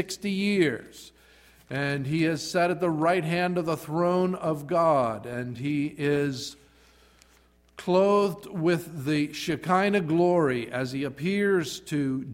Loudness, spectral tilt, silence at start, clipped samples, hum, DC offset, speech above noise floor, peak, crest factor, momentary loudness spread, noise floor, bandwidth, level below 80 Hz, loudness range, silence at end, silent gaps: -26 LUFS; -6 dB/octave; 0 s; under 0.1%; none; under 0.1%; 35 dB; -10 dBFS; 18 dB; 8 LU; -60 dBFS; 16 kHz; -62 dBFS; 3 LU; 0 s; none